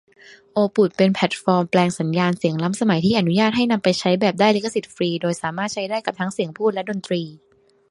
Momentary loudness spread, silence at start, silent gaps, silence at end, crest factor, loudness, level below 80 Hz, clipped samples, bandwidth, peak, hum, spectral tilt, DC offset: 8 LU; 0.55 s; none; 0.55 s; 18 dB; -20 LUFS; -60 dBFS; under 0.1%; 11.5 kHz; -2 dBFS; none; -5.5 dB/octave; under 0.1%